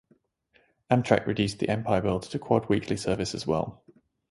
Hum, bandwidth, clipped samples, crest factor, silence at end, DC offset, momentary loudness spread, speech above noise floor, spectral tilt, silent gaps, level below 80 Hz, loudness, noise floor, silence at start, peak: none; 11.5 kHz; under 0.1%; 22 dB; 0.6 s; under 0.1%; 6 LU; 40 dB; -6 dB/octave; none; -52 dBFS; -27 LUFS; -67 dBFS; 0.9 s; -4 dBFS